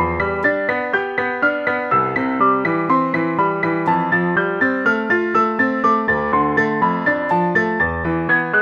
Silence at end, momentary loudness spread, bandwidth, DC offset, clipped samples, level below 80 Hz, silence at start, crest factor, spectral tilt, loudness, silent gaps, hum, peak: 0 s; 3 LU; 7.2 kHz; under 0.1%; under 0.1%; -44 dBFS; 0 s; 14 dB; -8 dB/octave; -17 LUFS; none; none; -2 dBFS